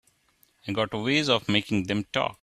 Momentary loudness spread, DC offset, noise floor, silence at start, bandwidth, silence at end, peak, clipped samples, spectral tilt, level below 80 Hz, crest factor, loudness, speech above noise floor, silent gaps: 8 LU; under 0.1%; -65 dBFS; 0.65 s; 14 kHz; 0.1 s; -6 dBFS; under 0.1%; -5 dB/octave; -58 dBFS; 22 dB; -26 LUFS; 39 dB; none